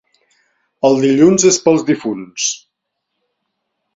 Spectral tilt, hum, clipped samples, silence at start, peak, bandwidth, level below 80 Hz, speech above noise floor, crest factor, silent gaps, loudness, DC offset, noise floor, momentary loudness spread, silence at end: -4 dB/octave; none; under 0.1%; 0.85 s; 0 dBFS; 7.8 kHz; -56 dBFS; 62 dB; 16 dB; none; -13 LUFS; under 0.1%; -75 dBFS; 9 LU; 1.4 s